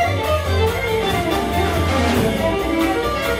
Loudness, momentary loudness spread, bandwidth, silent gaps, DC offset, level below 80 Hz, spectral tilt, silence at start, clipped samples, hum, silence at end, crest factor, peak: -19 LUFS; 2 LU; 16 kHz; none; under 0.1%; -30 dBFS; -5.5 dB/octave; 0 s; under 0.1%; none; 0 s; 12 dB; -6 dBFS